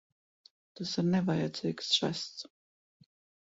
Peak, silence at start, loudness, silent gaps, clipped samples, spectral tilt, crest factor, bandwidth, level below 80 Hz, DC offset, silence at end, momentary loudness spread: -14 dBFS; 0.75 s; -32 LUFS; none; under 0.1%; -5 dB/octave; 20 dB; 8 kHz; -72 dBFS; under 0.1%; 1 s; 13 LU